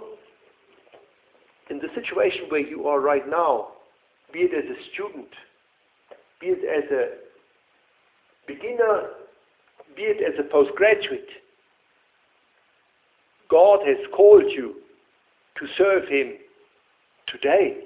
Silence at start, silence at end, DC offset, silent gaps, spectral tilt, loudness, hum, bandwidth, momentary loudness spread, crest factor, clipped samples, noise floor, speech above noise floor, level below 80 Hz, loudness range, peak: 0 s; 0 s; under 0.1%; none; -8 dB/octave; -21 LUFS; none; 4 kHz; 20 LU; 22 dB; under 0.1%; -64 dBFS; 44 dB; -66 dBFS; 11 LU; -2 dBFS